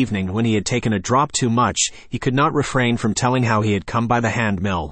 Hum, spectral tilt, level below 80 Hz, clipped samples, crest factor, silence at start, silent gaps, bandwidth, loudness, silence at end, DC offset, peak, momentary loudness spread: none; -5 dB/octave; -44 dBFS; under 0.1%; 14 dB; 0 s; none; 8.8 kHz; -19 LUFS; 0 s; under 0.1%; -4 dBFS; 3 LU